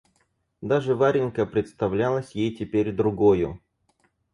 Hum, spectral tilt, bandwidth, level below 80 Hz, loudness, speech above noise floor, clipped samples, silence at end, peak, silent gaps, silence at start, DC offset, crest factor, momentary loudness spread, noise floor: none; -8 dB/octave; 10.5 kHz; -52 dBFS; -24 LUFS; 47 dB; under 0.1%; 0.75 s; -8 dBFS; none; 0.6 s; under 0.1%; 16 dB; 8 LU; -70 dBFS